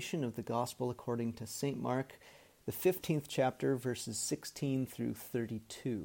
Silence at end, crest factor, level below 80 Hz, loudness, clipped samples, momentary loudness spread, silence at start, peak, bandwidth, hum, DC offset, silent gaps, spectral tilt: 0 s; 18 dB; -70 dBFS; -37 LUFS; under 0.1%; 8 LU; 0 s; -18 dBFS; 17 kHz; none; under 0.1%; none; -5 dB/octave